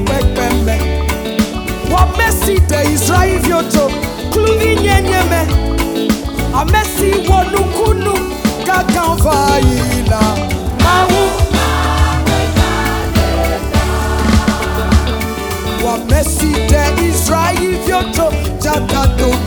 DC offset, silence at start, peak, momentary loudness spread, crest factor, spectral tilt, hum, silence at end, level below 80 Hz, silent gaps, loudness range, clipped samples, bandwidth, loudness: under 0.1%; 0 s; 0 dBFS; 5 LU; 12 dB; -5 dB/octave; none; 0 s; -18 dBFS; none; 2 LU; under 0.1%; over 20 kHz; -13 LUFS